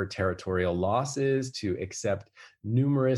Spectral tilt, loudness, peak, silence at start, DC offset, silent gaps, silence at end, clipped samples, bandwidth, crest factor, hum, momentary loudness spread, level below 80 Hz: -6 dB/octave; -29 LUFS; -14 dBFS; 0 s; under 0.1%; none; 0 s; under 0.1%; 11.5 kHz; 14 dB; none; 6 LU; -64 dBFS